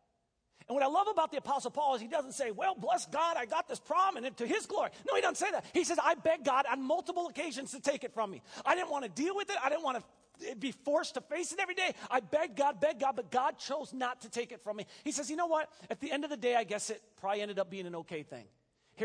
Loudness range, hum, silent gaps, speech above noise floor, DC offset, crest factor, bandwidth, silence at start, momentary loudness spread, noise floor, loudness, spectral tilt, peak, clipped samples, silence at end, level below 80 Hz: 4 LU; none; none; 45 dB; under 0.1%; 20 dB; 10.5 kHz; 0.7 s; 10 LU; -79 dBFS; -34 LUFS; -2.5 dB/octave; -14 dBFS; under 0.1%; 0 s; -80 dBFS